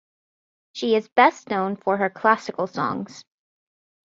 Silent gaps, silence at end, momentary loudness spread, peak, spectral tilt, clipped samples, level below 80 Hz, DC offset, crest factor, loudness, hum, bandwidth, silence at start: 1.12-1.16 s; 0.85 s; 12 LU; -2 dBFS; -5 dB/octave; under 0.1%; -68 dBFS; under 0.1%; 22 dB; -22 LUFS; none; 7.8 kHz; 0.75 s